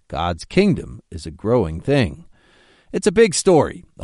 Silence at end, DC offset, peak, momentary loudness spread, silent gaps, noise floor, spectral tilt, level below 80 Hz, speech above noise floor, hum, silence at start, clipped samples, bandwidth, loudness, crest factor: 0 s; under 0.1%; -2 dBFS; 14 LU; none; -54 dBFS; -5.5 dB/octave; -40 dBFS; 35 dB; none; 0.1 s; under 0.1%; 11.5 kHz; -19 LUFS; 18 dB